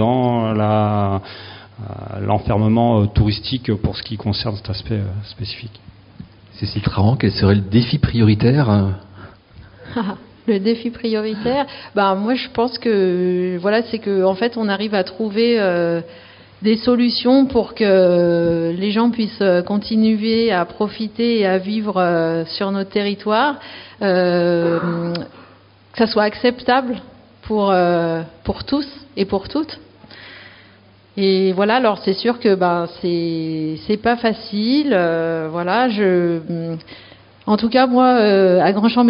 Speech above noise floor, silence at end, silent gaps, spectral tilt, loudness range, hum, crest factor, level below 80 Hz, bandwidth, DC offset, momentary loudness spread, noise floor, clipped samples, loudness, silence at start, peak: 31 dB; 0 s; none; -5.5 dB/octave; 5 LU; none; 16 dB; -42 dBFS; 5.6 kHz; under 0.1%; 12 LU; -48 dBFS; under 0.1%; -18 LUFS; 0 s; -2 dBFS